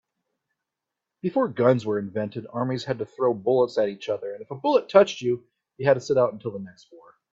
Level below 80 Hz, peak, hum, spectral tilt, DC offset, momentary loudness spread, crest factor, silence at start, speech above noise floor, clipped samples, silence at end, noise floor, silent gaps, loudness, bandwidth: -68 dBFS; -2 dBFS; none; -6.5 dB/octave; under 0.1%; 13 LU; 22 dB; 1.25 s; 62 dB; under 0.1%; 0.35 s; -86 dBFS; none; -24 LUFS; 7.8 kHz